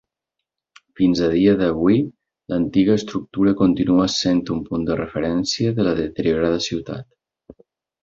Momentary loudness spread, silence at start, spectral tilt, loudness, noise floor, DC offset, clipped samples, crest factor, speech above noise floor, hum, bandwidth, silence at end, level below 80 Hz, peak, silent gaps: 8 LU; 1 s; -6 dB/octave; -19 LUFS; -82 dBFS; under 0.1%; under 0.1%; 16 dB; 64 dB; none; 7.6 kHz; 0.5 s; -46 dBFS; -4 dBFS; none